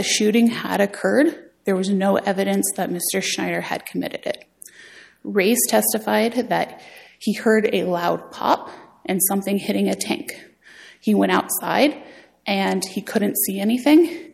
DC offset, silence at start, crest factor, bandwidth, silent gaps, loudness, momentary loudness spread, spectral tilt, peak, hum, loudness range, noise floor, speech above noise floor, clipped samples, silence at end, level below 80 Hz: under 0.1%; 0 s; 16 dB; 16.5 kHz; none; -20 LUFS; 12 LU; -4 dB/octave; -4 dBFS; none; 3 LU; -47 dBFS; 26 dB; under 0.1%; 0.05 s; -66 dBFS